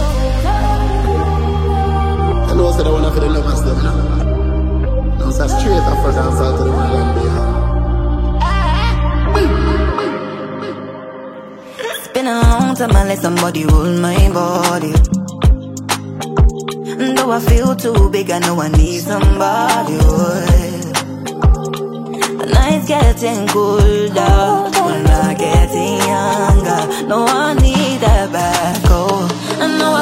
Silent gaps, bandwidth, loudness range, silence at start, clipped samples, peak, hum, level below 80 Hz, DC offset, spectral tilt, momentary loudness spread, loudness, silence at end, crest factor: none; 16 kHz; 3 LU; 0 s; under 0.1%; 0 dBFS; none; -16 dBFS; under 0.1%; -5.5 dB/octave; 7 LU; -15 LUFS; 0 s; 12 dB